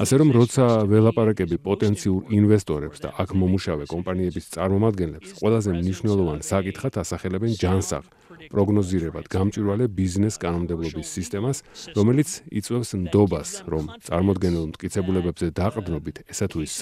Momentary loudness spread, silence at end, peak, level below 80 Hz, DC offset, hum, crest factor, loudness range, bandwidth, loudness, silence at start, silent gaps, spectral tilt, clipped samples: 11 LU; 0 s; -4 dBFS; -48 dBFS; under 0.1%; none; 18 dB; 4 LU; 15 kHz; -23 LUFS; 0 s; none; -6.5 dB/octave; under 0.1%